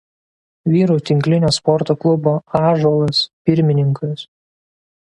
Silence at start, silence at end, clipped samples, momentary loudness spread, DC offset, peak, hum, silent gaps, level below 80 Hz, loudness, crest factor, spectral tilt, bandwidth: 0.65 s; 0.85 s; under 0.1%; 5 LU; under 0.1%; 0 dBFS; none; 3.33-3.45 s; -52 dBFS; -16 LUFS; 16 dB; -7 dB/octave; 11.5 kHz